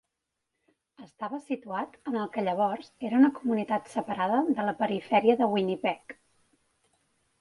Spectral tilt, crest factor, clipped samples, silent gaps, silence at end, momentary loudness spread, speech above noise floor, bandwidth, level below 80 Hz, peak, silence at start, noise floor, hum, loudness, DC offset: -7 dB/octave; 20 dB; under 0.1%; none; 1.3 s; 13 LU; 56 dB; 11.5 kHz; -74 dBFS; -10 dBFS; 1 s; -83 dBFS; none; -28 LUFS; under 0.1%